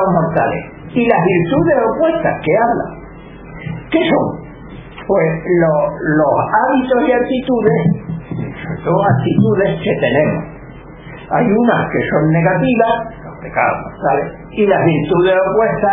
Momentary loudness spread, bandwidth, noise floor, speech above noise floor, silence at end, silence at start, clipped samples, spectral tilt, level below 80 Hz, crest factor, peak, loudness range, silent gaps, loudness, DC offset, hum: 17 LU; 3.8 kHz; -34 dBFS; 20 dB; 0 s; 0 s; under 0.1%; -11.5 dB/octave; -40 dBFS; 14 dB; 0 dBFS; 3 LU; none; -15 LUFS; under 0.1%; none